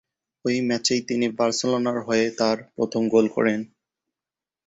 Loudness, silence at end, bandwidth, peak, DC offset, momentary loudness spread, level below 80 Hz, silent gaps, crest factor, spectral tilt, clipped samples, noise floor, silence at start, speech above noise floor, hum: -23 LUFS; 1 s; 8.2 kHz; -6 dBFS; under 0.1%; 6 LU; -66 dBFS; none; 18 dB; -4 dB/octave; under 0.1%; under -90 dBFS; 0.45 s; over 68 dB; none